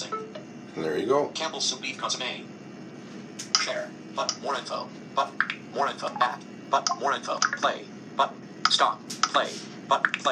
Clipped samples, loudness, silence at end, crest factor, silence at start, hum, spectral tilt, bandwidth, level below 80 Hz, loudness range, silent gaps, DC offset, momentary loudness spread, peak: under 0.1%; -27 LUFS; 0 s; 26 dB; 0 s; none; -2 dB/octave; 14 kHz; -80 dBFS; 4 LU; none; under 0.1%; 15 LU; -2 dBFS